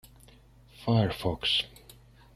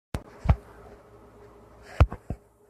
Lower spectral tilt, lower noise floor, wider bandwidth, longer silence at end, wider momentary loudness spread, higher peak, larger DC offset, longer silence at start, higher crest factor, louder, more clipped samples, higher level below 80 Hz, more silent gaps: second, -6 dB/octave vs -8 dB/octave; first, -56 dBFS vs -51 dBFS; first, 14.5 kHz vs 11.5 kHz; first, 0.7 s vs 0.35 s; second, 11 LU vs 24 LU; second, -12 dBFS vs -4 dBFS; neither; first, 0.8 s vs 0.15 s; second, 20 dB vs 26 dB; about the same, -28 LUFS vs -28 LUFS; neither; second, -54 dBFS vs -34 dBFS; neither